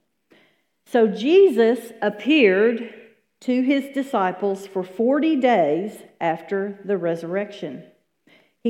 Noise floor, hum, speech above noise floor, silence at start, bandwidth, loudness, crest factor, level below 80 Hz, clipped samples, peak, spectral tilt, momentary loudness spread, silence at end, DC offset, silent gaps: -61 dBFS; none; 41 dB; 0.95 s; 13.5 kHz; -21 LUFS; 18 dB; -80 dBFS; under 0.1%; -4 dBFS; -6 dB/octave; 15 LU; 0 s; under 0.1%; none